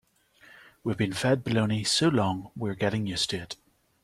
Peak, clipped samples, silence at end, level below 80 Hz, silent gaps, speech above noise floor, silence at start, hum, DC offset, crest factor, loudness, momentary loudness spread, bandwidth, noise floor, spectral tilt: -12 dBFS; under 0.1%; 0.5 s; -58 dBFS; none; 31 dB; 0.5 s; none; under 0.1%; 18 dB; -27 LUFS; 12 LU; 15 kHz; -58 dBFS; -4.5 dB/octave